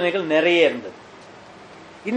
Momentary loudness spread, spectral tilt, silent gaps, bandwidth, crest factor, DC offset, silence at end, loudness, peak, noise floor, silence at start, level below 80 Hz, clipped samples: 18 LU; -5 dB/octave; none; 8.8 kHz; 20 dB; under 0.1%; 0 s; -18 LUFS; -4 dBFS; -43 dBFS; 0 s; -66 dBFS; under 0.1%